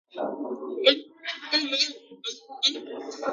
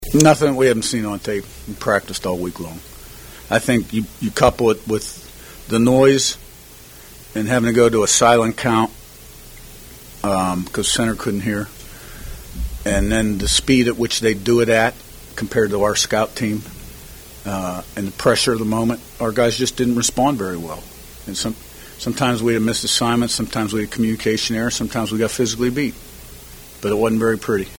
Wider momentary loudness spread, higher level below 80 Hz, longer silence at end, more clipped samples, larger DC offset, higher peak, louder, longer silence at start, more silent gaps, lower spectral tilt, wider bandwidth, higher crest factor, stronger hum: second, 14 LU vs 23 LU; second, -88 dBFS vs -36 dBFS; about the same, 0 s vs 0 s; neither; neither; second, -6 dBFS vs 0 dBFS; second, -26 LUFS vs -18 LUFS; first, 0.15 s vs 0 s; neither; second, -0.5 dB/octave vs -4 dB/octave; second, 9.4 kHz vs over 20 kHz; about the same, 24 dB vs 20 dB; neither